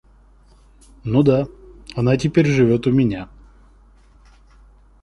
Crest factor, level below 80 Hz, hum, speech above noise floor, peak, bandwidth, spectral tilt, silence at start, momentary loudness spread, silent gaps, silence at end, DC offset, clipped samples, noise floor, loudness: 18 dB; -44 dBFS; none; 34 dB; -2 dBFS; 11 kHz; -8 dB/octave; 1.05 s; 17 LU; none; 1.75 s; under 0.1%; under 0.1%; -50 dBFS; -18 LUFS